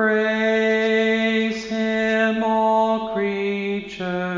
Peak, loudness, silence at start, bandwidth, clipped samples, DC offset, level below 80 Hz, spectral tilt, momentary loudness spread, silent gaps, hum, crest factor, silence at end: -8 dBFS; -20 LUFS; 0 s; 7.6 kHz; under 0.1%; under 0.1%; -58 dBFS; -5.5 dB/octave; 7 LU; none; none; 12 dB; 0 s